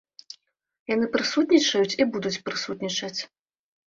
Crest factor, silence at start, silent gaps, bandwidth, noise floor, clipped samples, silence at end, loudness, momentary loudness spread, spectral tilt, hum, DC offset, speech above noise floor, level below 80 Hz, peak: 20 dB; 0.9 s; none; 7.8 kHz; -58 dBFS; under 0.1%; 0.6 s; -24 LUFS; 24 LU; -3.5 dB/octave; none; under 0.1%; 34 dB; -66 dBFS; -6 dBFS